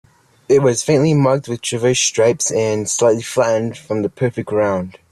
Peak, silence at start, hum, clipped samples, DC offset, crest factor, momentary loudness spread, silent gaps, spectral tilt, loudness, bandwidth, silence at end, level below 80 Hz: -2 dBFS; 0.5 s; none; under 0.1%; under 0.1%; 14 dB; 8 LU; none; -4.5 dB/octave; -16 LUFS; 14 kHz; 0.2 s; -54 dBFS